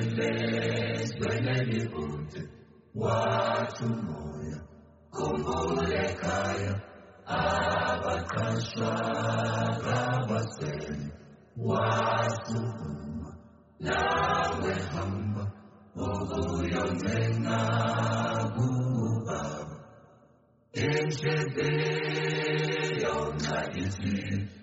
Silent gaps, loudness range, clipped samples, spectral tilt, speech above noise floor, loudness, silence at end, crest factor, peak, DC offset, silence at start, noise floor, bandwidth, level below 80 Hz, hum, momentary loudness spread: none; 3 LU; under 0.1%; -5 dB/octave; 33 dB; -30 LUFS; 0 s; 16 dB; -14 dBFS; under 0.1%; 0 s; -62 dBFS; 8 kHz; -52 dBFS; none; 11 LU